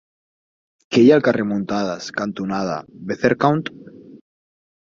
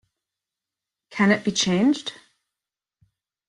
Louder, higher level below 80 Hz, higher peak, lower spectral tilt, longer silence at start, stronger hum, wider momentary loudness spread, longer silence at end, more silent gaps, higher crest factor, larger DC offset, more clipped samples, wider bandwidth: about the same, -19 LUFS vs -21 LUFS; about the same, -60 dBFS vs -64 dBFS; first, -2 dBFS vs -6 dBFS; first, -6.5 dB/octave vs -4 dB/octave; second, 0.9 s vs 1.1 s; neither; about the same, 13 LU vs 14 LU; second, 0.7 s vs 1.35 s; neither; about the same, 18 dB vs 20 dB; neither; neither; second, 7.6 kHz vs 11 kHz